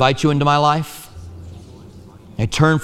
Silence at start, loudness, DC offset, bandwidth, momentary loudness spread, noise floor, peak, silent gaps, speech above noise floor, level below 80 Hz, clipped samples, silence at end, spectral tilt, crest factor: 0 s; -17 LUFS; under 0.1%; 14 kHz; 23 LU; -40 dBFS; 0 dBFS; none; 25 dB; -42 dBFS; under 0.1%; 0 s; -5.5 dB/octave; 18 dB